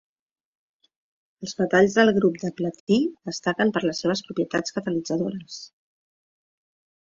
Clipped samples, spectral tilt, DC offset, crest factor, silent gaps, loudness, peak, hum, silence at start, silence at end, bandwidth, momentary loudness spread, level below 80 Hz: under 0.1%; -5 dB/octave; under 0.1%; 20 dB; 2.80-2.87 s; -23 LUFS; -6 dBFS; none; 1.4 s; 1.35 s; 7.8 kHz; 15 LU; -64 dBFS